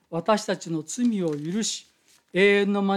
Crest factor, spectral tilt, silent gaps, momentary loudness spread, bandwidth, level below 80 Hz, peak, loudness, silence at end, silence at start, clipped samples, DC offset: 16 dB; -4.5 dB/octave; none; 11 LU; 13 kHz; -76 dBFS; -8 dBFS; -24 LUFS; 0 s; 0.1 s; under 0.1%; under 0.1%